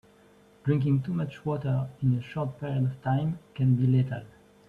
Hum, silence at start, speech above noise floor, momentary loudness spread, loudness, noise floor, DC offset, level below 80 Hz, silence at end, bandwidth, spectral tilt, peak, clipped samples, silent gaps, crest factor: none; 0.65 s; 31 dB; 8 LU; -28 LUFS; -58 dBFS; under 0.1%; -60 dBFS; 0.4 s; 4.3 kHz; -10 dB/octave; -14 dBFS; under 0.1%; none; 14 dB